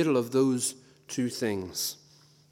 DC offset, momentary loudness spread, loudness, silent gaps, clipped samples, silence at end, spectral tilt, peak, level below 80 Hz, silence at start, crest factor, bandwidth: under 0.1%; 13 LU; -29 LUFS; none; under 0.1%; 0.55 s; -4.5 dB/octave; -14 dBFS; -74 dBFS; 0 s; 16 dB; 17 kHz